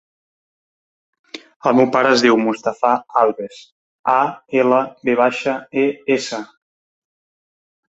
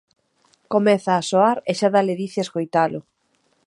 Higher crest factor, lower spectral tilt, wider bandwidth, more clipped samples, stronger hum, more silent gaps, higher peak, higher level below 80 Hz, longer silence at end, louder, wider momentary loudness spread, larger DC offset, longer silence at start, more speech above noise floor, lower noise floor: about the same, 18 dB vs 18 dB; about the same, -4.5 dB/octave vs -5.5 dB/octave; second, 8 kHz vs 11 kHz; neither; neither; first, 1.56-1.60 s, 3.72-4.04 s vs none; first, 0 dBFS vs -4 dBFS; about the same, -66 dBFS vs -70 dBFS; first, 1.5 s vs 0.65 s; first, -17 LUFS vs -20 LUFS; first, 16 LU vs 7 LU; neither; first, 1.35 s vs 0.7 s; first, over 73 dB vs 47 dB; first, under -90 dBFS vs -66 dBFS